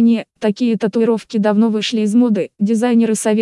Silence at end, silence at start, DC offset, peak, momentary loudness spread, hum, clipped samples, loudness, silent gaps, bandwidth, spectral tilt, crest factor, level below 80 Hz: 0 s; 0 s; under 0.1%; -4 dBFS; 4 LU; none; under 0.1%; -16 LUFS; none; 12 kHz; -5.5 dB/octave; 12 dB; -72 dBFS